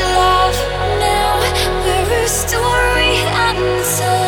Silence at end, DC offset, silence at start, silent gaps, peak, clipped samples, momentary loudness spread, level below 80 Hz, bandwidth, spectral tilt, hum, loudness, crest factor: 0 s; under 0.1%; 0 s; none; -2 dBFS; under 0.1%; 4 LU; -26 dBFS; 19.5 kHz; -3 dB/octave; none; -14 LUFS; 12 dB